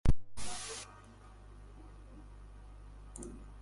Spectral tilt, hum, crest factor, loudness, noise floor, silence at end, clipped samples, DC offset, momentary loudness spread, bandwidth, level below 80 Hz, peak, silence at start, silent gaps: -4.5 dB/octave; 50 Hz at -55 dBFS; 22 dB; -46 LUFS; -55 dBFS; 0 s; under 0.1%; under 0.1%; 15 LU; 11.5 kHz; -44 dBFS; -14 dBFS; 0.05 s; none